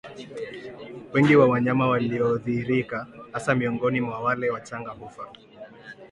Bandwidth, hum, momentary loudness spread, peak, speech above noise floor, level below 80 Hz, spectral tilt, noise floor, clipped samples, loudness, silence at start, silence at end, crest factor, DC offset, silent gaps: 11 kHz; none; 23 LU; -6 dBFS; 21 dB; -60 dBFS; -7.5 dB/octave; -44 dBFS; under 0.1%; -23 LUFS; 0.05 s; 0.05 s; 18 dB; under 0.1%; none